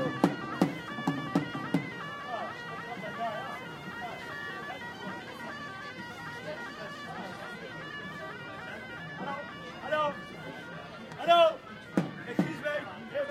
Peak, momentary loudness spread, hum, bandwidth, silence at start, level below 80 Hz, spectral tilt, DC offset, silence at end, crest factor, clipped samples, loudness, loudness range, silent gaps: -8 dBFS; 11 LU; none; 15.5 kHz; 0 s; -70 dBFS; -6 dB/octave; under 0.1%; 0 s; 26 dB; under 0.1%; -34 LUFS; 10 LU; none